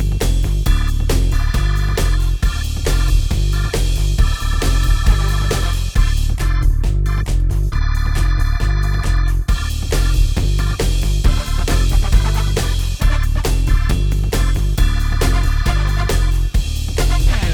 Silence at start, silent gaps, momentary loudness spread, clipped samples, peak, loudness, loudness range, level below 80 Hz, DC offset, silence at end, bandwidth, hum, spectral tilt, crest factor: 0 s; none; 3 LU; under 0.1%; 0 dBFS; -18 LUFS; 1 LU; -16 dBFS; under 0.1%; 0 s; 16 kHz; none; -5 dB/octave; 14 dB